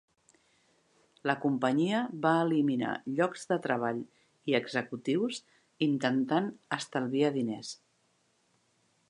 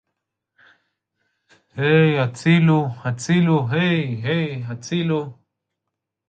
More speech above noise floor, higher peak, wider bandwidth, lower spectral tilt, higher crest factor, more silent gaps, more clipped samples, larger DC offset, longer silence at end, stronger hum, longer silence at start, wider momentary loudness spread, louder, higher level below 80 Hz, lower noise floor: second, 42 dB vs 63 dB; second, -10 dBFS vs -4 dBFS; first, 11 kHz vs 9 kHz; about the same, -5.5 dB/octave vs -6.5 dB/octave; first, 22 dB vs 16 dB; neither; neither; neither; first, 1.35 s vs 0.95 s; neither; second, 1.25 s vs 1.75 s; about the same, 10 LU vs 11 LU; second, -31 LUFS vs -20 LUFS; second, -82 dBFS vs -62 dBFS; second, -72 dBFS vs -81 dBFS